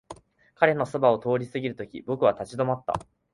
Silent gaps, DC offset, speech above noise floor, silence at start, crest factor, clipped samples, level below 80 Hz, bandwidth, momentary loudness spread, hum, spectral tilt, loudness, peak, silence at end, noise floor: none; under 0.1%; 22 dB; 0.1 s; 22 dB; under 0.1%; -60 dBFS; 11.5 kHz; 10 LU; none; -7 dB/octave; -26 LUFS; -4 dBFS; 0.3 s; -48 dBFS